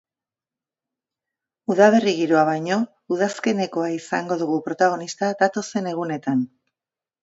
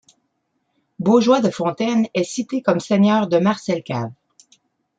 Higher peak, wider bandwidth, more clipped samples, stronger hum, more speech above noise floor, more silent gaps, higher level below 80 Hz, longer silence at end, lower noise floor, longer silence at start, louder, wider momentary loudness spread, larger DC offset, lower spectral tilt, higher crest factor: about the same, -2 dBFS vs -2 dBFS; second, 8 kHz vs 9 kHz; neither; neither; first, over 69 dB vs 53 dB; neither; second, -72 dBFS vs -64 dBFS; about the same, 0.75 s vs 0.85 s; first, under -90 dBFS vs -71 dBFS; first, 1.7 s vs 1 s; about the same, -21 LUFS vs -19 LUFS; about the same, 10 LU vs 9 LU; neither; about the same, -5.5 dB/octave vs -6 dB/octave; about the same, 20 dB vs 18 dB